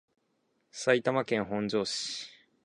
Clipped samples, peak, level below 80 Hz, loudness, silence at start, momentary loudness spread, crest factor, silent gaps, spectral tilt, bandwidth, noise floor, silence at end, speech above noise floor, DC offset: under 0.1%; -10 dBFS; -70 dBFS; -30 LUFS; 0.75 s; 14 LU; 22 dB; none; -4 dB/octave; 11 kHz; -75 dBFS; 0.35 s; 45 dB; under 0.1%